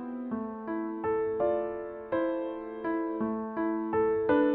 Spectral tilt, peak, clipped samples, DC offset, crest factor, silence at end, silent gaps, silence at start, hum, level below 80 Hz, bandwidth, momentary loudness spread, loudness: -10 dB/octave; -14 dBFS; under 0.1%; under 0.1%; 16 dB; 0 s; none; 0 s; none; -62 dBFS; 4.2 kHz; 8 LU; -31 LUFS